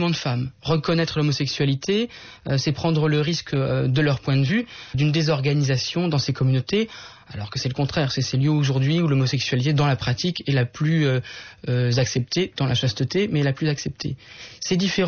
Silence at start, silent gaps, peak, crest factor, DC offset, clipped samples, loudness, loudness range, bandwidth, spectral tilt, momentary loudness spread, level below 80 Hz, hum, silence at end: 0 s; none; -10 dBFS; 12 dB; under 0.1%; under 0.1%; -22 LUFS; 2 LU; 6.8 kHz; -5.5 dB/octave; 9 LU; -50 dBFS; none; 0 s